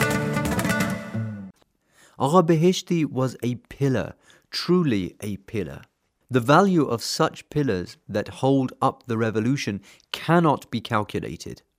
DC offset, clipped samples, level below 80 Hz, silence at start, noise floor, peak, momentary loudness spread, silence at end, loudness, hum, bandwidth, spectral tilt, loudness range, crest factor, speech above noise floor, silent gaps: under 0.1%; under 0.1%; -54 dBFS; 0 s; -62 dBFS; -2 dBFS; 14 LU; 0.25 s; -24 LUFS; none; 16 kHz; -6 dB/octave; 3 LU; 20 dB; 39 dB; none